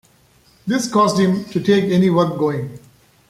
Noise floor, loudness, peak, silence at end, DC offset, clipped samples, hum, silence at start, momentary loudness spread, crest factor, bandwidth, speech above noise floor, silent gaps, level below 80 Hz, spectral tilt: -54 dBFS; -17 LUFS; -2 dBFS; 0.5 s; under 0.1%; under 0.1%; none; 0.65 s; 11 LU; 16 dB; 13.5 kHz; 37 dB; none; -56 dBFS; -6 dB/octave